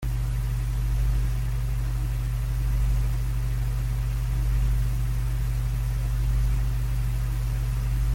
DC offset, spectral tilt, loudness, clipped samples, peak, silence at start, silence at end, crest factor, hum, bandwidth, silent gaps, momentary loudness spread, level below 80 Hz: under 0.1%; -6.5 dB/octave; -28 LUFS; under 0.1%; -16 dBFS; 0 s; 0 s; 10 dB; none; 16.5 kHz; none; 3 LU; -26 dBFS